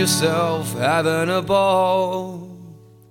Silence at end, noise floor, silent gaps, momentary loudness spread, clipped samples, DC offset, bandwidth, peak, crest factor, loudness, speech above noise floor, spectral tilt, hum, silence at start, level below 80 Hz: 0.35 s; -43 dBFS; none; 14 LU; under 0.1%; under 0.1%; 18 kHz; -6 dBFS; 14 dB; -19 LUFS; 24 dB; -4 dB/octave; none; 0 s; -58 dBFS